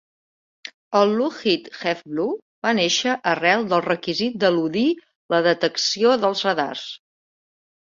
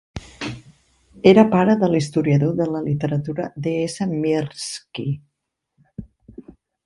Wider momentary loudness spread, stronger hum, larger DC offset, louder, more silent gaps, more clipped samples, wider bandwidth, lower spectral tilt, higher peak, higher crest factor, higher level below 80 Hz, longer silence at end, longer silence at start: second, 11 LU vs 23 LU; neither; neither; about the same, -21 LUFS vs -20 LUFS; first, 2.42-2.62 s, 5.15-5.29 s vs none; neither; second, 7.6 kHz vs 11.5 kHz; second, -3.5 dB/octave vs -7 dB/octave; about the same, -2 dBFS vs 0 dBFS; about the same, 20 dB vs 20 dB; second, -66 dBFS vs -52 dBFS; first, 1 s vs 0.45 s; first, 0.9 s vs 0.15 s